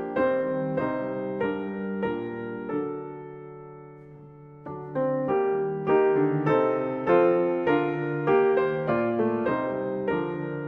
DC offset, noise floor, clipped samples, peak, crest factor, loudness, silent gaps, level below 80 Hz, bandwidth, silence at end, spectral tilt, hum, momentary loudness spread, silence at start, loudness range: under 0.1%; -46 dBFS; under 0.1%; -10 dBFS; 16 dB; -26 LUFS; none; -62 dBFS; 5.2 kHz; 0 s; -9.5 dB/octave; none; 18 LU; 0 s; 10 LU